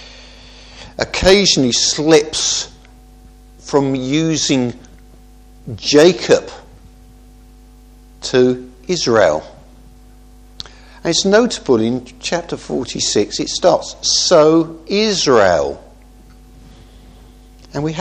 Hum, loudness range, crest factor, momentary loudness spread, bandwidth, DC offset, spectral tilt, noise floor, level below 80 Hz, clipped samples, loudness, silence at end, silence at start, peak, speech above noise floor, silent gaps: 50 Hz at -45 dBFS; 5 LU; 16 dB; 15 LU; 12.5 kHz; under 0.1%; -3.5 dB/octave; -42 dBFS; -40 dBFS; under 0.1%; -14 LUFS; 0 s; 0 s; 0 dBFS; 28 dB; none